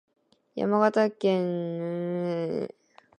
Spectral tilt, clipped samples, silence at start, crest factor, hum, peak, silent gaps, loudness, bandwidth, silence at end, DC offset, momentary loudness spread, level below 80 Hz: -7.5 dB/octave; under 0.1%; 0.55 s; 20 dB; none; -8 dBFS; none; -27 LUFS; 10 kHz; 0.5 s; under 0.1%; 10 LU; -74 dBFS